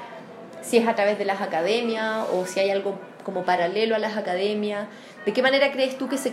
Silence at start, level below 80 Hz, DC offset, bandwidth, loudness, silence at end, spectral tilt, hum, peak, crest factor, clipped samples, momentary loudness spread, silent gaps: 0 s; -80 dBFS; under 0.1%; 15.5 kHz; -24 LUFS; 0 s; -4 dB/octave; none; -6 dBFS; 18 dB; under 0.1%; 12 LU; none